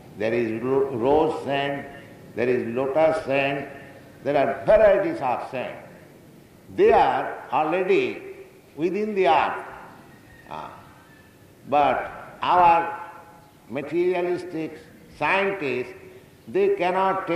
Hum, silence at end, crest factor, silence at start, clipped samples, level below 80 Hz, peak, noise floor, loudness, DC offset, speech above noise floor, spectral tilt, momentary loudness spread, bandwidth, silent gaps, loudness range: none; 0 s; 18 dB; 0.05 s; under 0.1%; -54 dBFS; -6 dBFS; -51 dBFS; -23 LUFS; under 0.1%; 29 dB; -6.5 dB/octave; 19 LU; 14 kHz; none; 5 LU